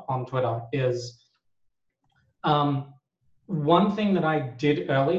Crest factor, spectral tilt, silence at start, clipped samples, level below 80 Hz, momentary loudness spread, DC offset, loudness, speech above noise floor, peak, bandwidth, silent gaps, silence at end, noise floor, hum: 20 dB; -7.5 dB/octave; 0 s; under 0.1%; -64 dBFS; 12 LU; under 0.1%; -25 LUFS; 50 dB; -6 dBFS; 7.8 kHz; none; 0 s; -75 dBFS; none